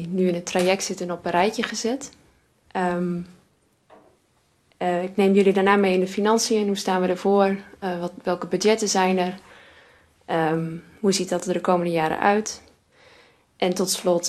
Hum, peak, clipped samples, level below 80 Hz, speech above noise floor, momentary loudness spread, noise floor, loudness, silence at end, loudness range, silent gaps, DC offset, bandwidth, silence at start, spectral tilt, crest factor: none; -4 dBFS; under 0.1%; -64 dBFS; 42 dB; 10 LU; -64 dBFS; -23 LUFS; 0 s; 7 LU; none; under 0.1%; 13 kHz; 0 s; -4.5 dB/octave; 20 dB